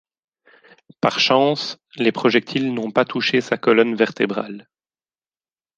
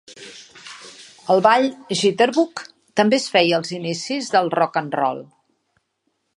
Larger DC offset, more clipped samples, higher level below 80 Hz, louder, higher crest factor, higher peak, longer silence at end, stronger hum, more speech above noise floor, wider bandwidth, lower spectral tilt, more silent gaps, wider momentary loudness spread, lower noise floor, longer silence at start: neither; neither; first, -66 dBFS vs -74 dBFS; about the same, -19 LUFS vs -19 LUFS; about the same, 20 dB vs 20 dB; about the same, -2 dBFS vs 0 dBFS; about the same, 1.15 s vs 1.1 s; neither; first, over 71 dB vs 53 dB; second, 7.6 kHz vs 11.5 kHz; about the same, -5 dB/octave vs -4 dB/octave; neither; second, 10 LU vs 22 LU; first, under -90 dBFS vs -72 dBFS; first, 1.05 s vs 0.1 s